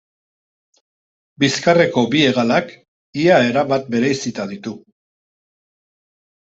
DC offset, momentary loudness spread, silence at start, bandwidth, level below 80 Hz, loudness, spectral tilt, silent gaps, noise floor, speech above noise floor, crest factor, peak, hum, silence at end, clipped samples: under 0.1%; 16 LU; 1.4 s; 8 kHz; -60 dBFS; -16 LUFS; -5 dB/octave; 2.88-3.13 s; under -90 dBFS; over 74 dB; 18 dB; -2 dBFS; none; 1.75 s; under 0.1%